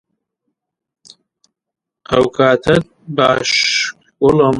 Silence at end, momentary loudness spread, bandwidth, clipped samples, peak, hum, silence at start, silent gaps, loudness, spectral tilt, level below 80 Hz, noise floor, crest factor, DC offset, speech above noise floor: 0 s; 5 LU; 11.5 kHz; under 0.1%; 0 dBFS; none; 2.1 s; none; -14 LUFS; -4 dB/octave; -46 dBFS; -83 dBFS; 16 dB; under 0.1%; 70 dB